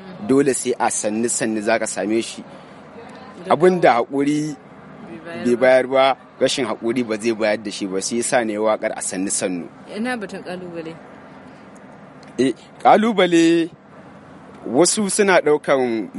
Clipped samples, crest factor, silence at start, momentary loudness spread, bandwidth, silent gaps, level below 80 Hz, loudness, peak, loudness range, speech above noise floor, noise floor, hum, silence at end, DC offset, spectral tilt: under 0.1%; 20 dB; 0 s; 19 LU; 11.5 kHz; none; -64 dBFS; -19 LUFS; 0 dBFS; 7 LU; 24 dB; -42 dBFS; none; 0 s; under 0.1%; -4 dB/octave